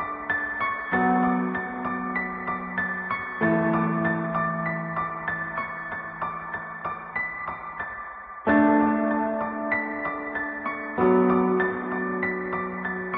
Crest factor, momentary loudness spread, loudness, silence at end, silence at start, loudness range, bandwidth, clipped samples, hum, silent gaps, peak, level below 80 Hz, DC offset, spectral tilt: 16 dB; 11 LU; -26 LUFS; 0 s; 0 s; 6 LU; 4.8 kHz; under 0.1%; none; none; -8 dBFS; -56 dBFS; under 0.1%; -6 dB/octave